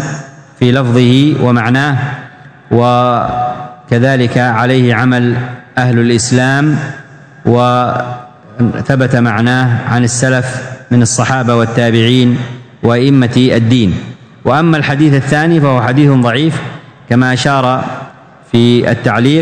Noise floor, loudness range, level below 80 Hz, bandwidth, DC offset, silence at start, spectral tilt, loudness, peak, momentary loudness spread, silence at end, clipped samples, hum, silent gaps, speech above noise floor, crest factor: -33 dBFS; 2 LU; -44 dBFS; 9.6 kHz; under 0.1%; 0 s; -6 dB/octave; -11 LUFS; 0 dBFS; 11 LU; 0 s; 1%; none; none; 24 dB; 10 dB